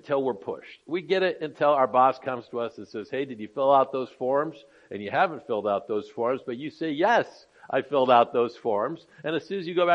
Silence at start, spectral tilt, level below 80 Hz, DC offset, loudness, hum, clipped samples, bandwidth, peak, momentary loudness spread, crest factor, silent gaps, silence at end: 0.05 s; -6.5 dB/octave; -76 dBFS; under 0.1%; -26 LUFS; none; under 0.1%; 7.6 kHz; -6 dBFS; 13 LU; 20 dB; none; 0 s